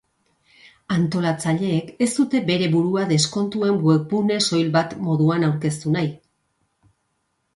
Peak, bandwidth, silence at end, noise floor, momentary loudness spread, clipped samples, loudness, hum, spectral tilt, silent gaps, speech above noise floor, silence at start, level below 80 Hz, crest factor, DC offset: -4 dBFS; 11.5 kHz; 1.4 s; -72 dBFS; 5 LU; under 0.1%; -21 LUFS; none; -5.5 dB/octave; none; 52 dB; 0.9 s; -60 dBFS; 18 dB; under 0.1%